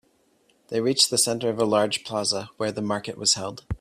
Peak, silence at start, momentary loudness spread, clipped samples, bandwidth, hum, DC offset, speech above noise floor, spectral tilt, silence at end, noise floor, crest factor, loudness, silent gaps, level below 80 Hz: -6 dBFS; 0.7 s; 10 LU; under 0.1%; 15.5 kHz; none; under 0.1%; 39 dB; -2.5 dB/octave; 0.05 s; -64 dBFS; 20 dB; -23 LUFS; none; -50 dBFS